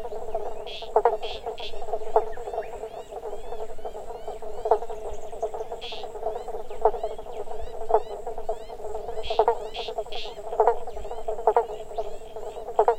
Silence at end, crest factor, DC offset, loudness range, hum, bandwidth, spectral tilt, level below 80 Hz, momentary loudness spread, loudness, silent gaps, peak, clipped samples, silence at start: 0 s; 22 dB; under 0.1%; 5 LU; none; 8.8 kHz; -4 dB/octave; -42 dBFS; 13 LU; -30 LUFS; none; -4 dBFS; under 0.1%; 0 s